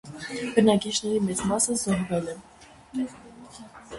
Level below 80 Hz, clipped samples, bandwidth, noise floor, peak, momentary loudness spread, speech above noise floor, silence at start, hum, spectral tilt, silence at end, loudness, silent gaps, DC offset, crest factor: -56 dBFS; under 0.1%; 11.5 kHz; -46 dBFS; -6 dBFS; 24 LU; 21 dB; 0.05 s; none; -4 dB/octave; 0 s; -25 LUFS; none; under 0.1%; 22 dB